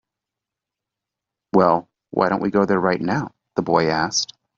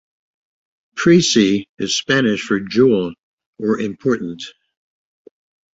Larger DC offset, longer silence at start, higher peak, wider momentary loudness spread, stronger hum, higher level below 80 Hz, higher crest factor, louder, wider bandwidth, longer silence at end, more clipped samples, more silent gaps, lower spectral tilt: neither; first, 1.55 s vs 0.95 s; about the same, -2 dBFS vs -2 dBFS; second, 8 LU vs 15 LU; neither; about the same, -58 dBFS vs -56 dBFS; about the same, 18 dB vs 18 dB; second, -20 LUFS vs -17 LUFS; about the same, 7.8 kHz vs 8 kHz; second, 0.3 s vs 1.25 s; neither; second, none vs 1.69-1.77 s, 3.19-3.38 s, 3.46-3.53 s; about the same, -4.5 dB/octave vs -4.5 dB/octave